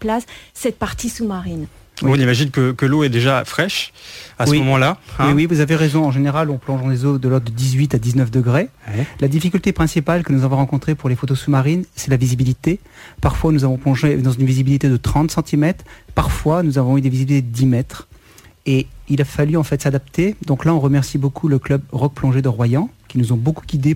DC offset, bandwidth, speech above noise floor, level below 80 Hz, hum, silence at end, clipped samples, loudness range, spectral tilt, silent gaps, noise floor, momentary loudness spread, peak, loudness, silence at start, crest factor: under 0.1%; 16 kHz; 29 dB; -36 dBFS; none; 0 s; under 0.1%; 2 LU; -6.5 dB/octave; none; -46 dBFS; 8 LU; -4 dBFS; -17 LUFS; 0 s; 14 dB